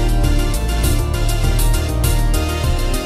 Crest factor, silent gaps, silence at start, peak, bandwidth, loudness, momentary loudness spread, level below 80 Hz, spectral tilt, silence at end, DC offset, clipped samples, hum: 12 dB; none; 0 s; -4 dBFS; 15.5 kHz; -18 LUFS; 2 LU; -16 dBFS; -5 dB/octave; 0 s; under 0.1%; under 0.1%; none